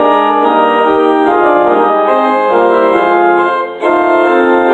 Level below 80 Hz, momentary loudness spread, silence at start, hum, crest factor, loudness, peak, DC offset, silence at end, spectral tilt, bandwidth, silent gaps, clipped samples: -50 dBFS; 2 LU; 0 s; none; 8 dB; -9 LUFS; 0 dBFS; under 0.1%; 0 s; -6 dB/octave; 8.4 kHz; none; under 0.1%